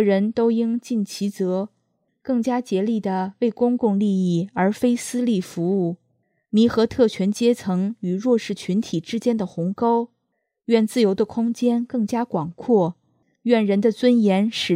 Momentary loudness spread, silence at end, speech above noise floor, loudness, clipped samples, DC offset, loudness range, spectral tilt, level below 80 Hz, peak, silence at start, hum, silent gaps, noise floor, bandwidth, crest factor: 8 LU; 0 s; 55 dB; -21 LUFS; under 0.1%; under 0.1%; 2 LU; -6.5 dB/octave; -62 dBFS; -4 dBFS; 0 s; none; none; -75 dBFS; 14.5 kHz; 18 dB